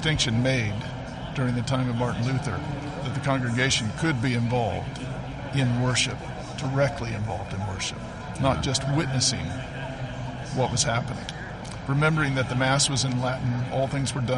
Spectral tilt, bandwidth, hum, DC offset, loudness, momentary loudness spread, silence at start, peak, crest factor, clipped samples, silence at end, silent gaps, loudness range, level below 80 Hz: -4.5 dB/octave; 11.5 kHz; none; under 0.1%; -26 LUFS; 11 LU; 0 s; -10 dBFS; 16 dB; under 0.1%; 0 s; none; 2 LU; -44 dBFS